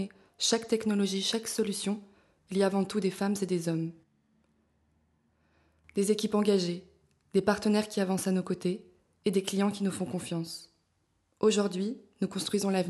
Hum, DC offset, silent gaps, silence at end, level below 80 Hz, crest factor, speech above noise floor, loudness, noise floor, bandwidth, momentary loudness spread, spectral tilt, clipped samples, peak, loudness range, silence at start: none; under 0.1%; none; 0 s; -70 dBFS; 20 dB; 45 dB; -30 LUFS; -74 dBFS; 12.5 kHz; 9 LU; -5 dB/octave; under 0.1%; -12 dBFS; 4 LU; 0 s